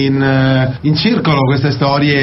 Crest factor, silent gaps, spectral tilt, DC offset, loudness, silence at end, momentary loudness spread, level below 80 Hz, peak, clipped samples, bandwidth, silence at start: 10 dB; none; -8.5 dB/octave; under 0.1%; -13 LUFS; 0 s; 2 LU; -40 dBFS; -2 dBFS; under 0.1%; 6 kHz; 0 s